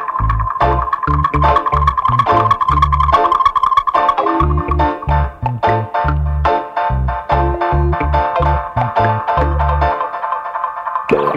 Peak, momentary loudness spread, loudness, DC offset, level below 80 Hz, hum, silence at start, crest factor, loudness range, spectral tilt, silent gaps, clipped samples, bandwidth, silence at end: 0 dBFS; 6 LU; -15 LUFS; under 0.1%; -22 dBFS; none; 0 s; 14 dB; 4 LU; -8 dB/octave; none; under 0.1%; 6.6 kHz; 0 s